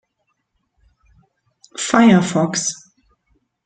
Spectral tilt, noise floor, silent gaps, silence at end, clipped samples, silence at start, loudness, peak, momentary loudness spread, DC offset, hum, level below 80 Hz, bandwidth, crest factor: -4.5 dB/octave; -71 dBFS; none; 0.9 s; under 0.1%; 1.75 s; -16 LUFS; 0 dBFS; 21 LU; under 0.1%; none; -58 dBFS; 9.4 kHz; 20 dB